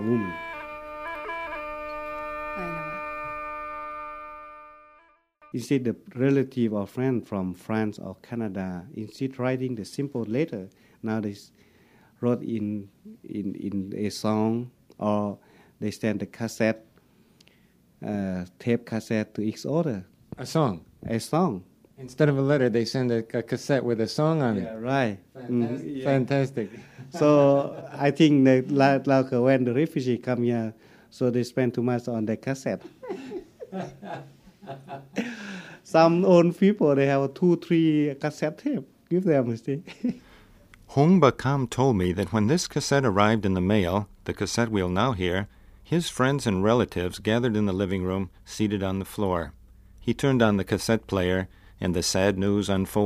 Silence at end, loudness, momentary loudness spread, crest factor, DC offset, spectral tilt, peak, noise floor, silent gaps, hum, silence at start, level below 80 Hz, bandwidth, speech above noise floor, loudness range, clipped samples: 0 s; -25 LUFS; 16 LU; 22 dB; under 0.1%; -6.5 dB/octave; -4 dBFS; -60 dBFS; none; none; 0 s; -54 dBFS; 15.5 kHz; 36 dB; 10 LU; under 0.1%